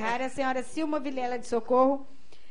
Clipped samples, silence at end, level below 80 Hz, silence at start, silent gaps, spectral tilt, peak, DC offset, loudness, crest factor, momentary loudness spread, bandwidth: under 0.1%; 0.45 s; -62 dBFS; 0 s; none; -4.5 dB/octave; -10 dBFS; 2%; -29 LUFS; 18 dB; 8 LU; 10.5 kHz